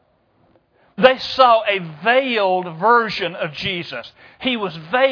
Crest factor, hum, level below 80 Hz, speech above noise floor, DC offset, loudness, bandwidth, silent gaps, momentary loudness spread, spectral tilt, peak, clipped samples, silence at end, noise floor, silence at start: 18 dB; none; -58 dBFS; 42 dB; under 0.1%; -17 LUFS; 5.4 kHz; none; 12 LU; -5.5 dB/octave; 0 dBFS; under 0.1%; 0 s; -59 dBFS; 1 s